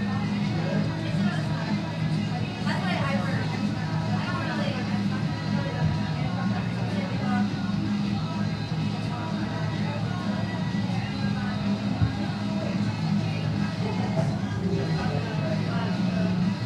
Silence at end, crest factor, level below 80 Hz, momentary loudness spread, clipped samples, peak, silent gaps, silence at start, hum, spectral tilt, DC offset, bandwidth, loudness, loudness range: 0 s; 16 dB; -50 dBFS; 3 LU; under 0.1%; -10 dBFS; none; 0 s; none; -7 dB/octave; under 0.1%; 10.5 kHz; -27 LUFS; 1 LU